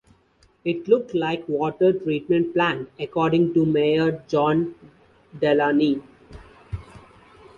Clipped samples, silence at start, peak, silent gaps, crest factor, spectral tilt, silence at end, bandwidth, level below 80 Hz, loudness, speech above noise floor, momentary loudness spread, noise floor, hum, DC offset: under 0.1%; 0.65 s; -6 dBFS; none; 18 dB; -8 dB/octave; 0.6 s; 7.2 kHz; -52 dBFS; -22 LUFS; 39 dB; 11 LU; -60 dBFS; none; under 0.1%